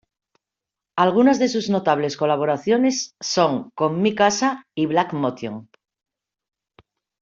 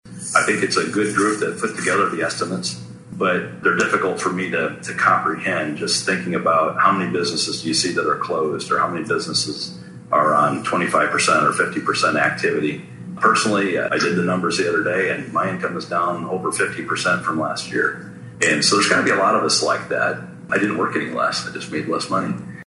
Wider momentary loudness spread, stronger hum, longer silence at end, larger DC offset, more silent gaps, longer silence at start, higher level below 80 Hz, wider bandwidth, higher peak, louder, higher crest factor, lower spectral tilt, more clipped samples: about the same, 9 LU vs 8 LU; neither; first, 1.6 s vs 0.15 s; neither; neither; first, 0.95 s vs 0.05 s; about the same, -66 dBFS vs -62 dBFS; second, 7.6 kHz vs 11.5 kHz; about the same, -4 dBFS vs -2 dBFS; about the same, -20 LUFS vs -19 LUFS; about the same, 18 dB vs 20 dB; about the same, -4.5 dB/octave vs -3.5 dB/octave; neither